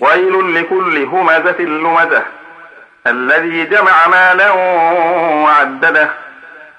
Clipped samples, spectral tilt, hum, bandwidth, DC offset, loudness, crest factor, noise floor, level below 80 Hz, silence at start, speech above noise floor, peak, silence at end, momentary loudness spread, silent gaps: under 0.1%; -5 dB/octave; none; 10 kHz; under 0.1%; -10 LUFS; 12 dB; -38 dBFS; -68 dBFS; 0 s; 27 dB; 0 dBFS; 0.15 s; 8 LU; none